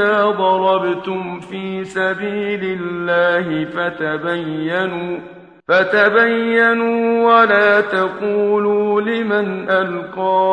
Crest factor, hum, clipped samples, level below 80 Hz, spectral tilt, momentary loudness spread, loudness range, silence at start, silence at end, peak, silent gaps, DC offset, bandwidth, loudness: 16 dB; none; under 0.1%; -60 dBFS; -6.5 dB/octave; 11 LU; 6 LU; 0 s; 0 s; 0 dBFS; none; under 0.1%; 9.2 kHz; -16 LUFS